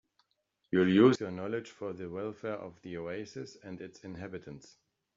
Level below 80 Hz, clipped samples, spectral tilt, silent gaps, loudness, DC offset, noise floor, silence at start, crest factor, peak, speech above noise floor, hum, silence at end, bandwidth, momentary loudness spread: -72 dBFS; under 0.1%; -6 dB/octave; none; -31 LUFS; under 0.1%; -80 dBFS; 0.7 s; 22 dB; -12 dBFS; 47 dB; none; 0.6 s; 7.6 kHz; 21 LU